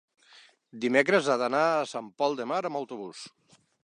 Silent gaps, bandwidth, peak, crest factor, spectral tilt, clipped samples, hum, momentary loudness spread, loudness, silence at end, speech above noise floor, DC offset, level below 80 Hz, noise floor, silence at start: none; 11 kHz; -6 dBFS; 22 dB; -4.5 dB/octave; under 0.1%; none; 17 LU; -27 LUFS; 0.55 s; 30 dB; under 0.1%; -82 dBFS; -57 dBFS; 0.75 s